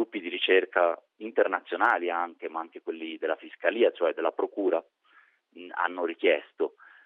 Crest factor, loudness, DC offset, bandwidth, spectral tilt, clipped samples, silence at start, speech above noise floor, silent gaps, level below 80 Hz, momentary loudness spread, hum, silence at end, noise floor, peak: 22 dB; -28 LUFS; under 0.1%; 4.1 kHz; 0.5 dB/octave; under 0.1%; 0 s; 34 dB; none; -86 dBFS; 13 LU; none; 0.35 s; -62 dBFS; -6 dBFS